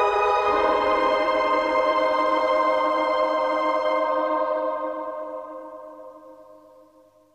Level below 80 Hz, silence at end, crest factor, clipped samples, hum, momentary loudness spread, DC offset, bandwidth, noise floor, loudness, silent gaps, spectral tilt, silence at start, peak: -56 dBFS; 0.8 s; 14 dB; under 0.1%; none; 15 LU; under 0.1%; 10 kHz; -55 dBFS; -22 LUFS; none; -4 dB/octave; 0 s; -8 dBFS